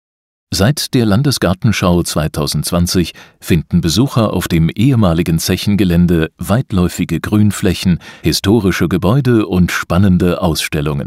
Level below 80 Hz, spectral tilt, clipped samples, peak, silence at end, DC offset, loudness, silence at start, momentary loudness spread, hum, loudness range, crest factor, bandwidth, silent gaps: -32 dBFS; -5.5 dB/octave; under 0.1%; 0 dBFS; 0 s; under 0.1%; -14 LUFS; 0.5 s; 5 LU; none; 1 LU; 12 dB; 16 kHz; none